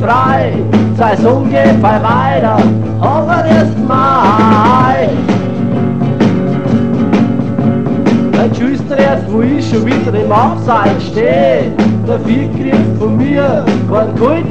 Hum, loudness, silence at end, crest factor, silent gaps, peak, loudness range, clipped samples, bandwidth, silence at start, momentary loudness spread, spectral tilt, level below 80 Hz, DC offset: none; -11 LUFS; 0 s; 10 dB; none; 0 dBFS; 2 LU; under 0.1%; 8.4 kHz; 0 s; 5 LU; -8 dB/octave; -36 dBFS; 3%